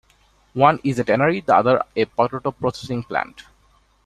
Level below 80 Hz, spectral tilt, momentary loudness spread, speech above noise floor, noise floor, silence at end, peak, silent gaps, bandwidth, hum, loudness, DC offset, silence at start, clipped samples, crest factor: -54 dBFS; -6.5 dB/octave; 10 LU; 39 dB; -58 dBFS; 0.65 s; -2 dBFS; none; 12.5 kHz; none; -20 LUFS; under 0.1%; 0.55 s; under 0.1%; 20 dB